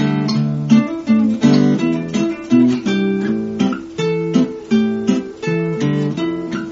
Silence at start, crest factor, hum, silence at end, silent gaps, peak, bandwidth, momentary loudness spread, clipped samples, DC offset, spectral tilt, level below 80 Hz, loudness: 0 s; 14 dB; none; 0 s; none; -2 dBFS; 7.8 kHz; 7 LU; under 0.1%; under 0.1%; -6.5 dB/octave; -54 dBFS; -17 LUFS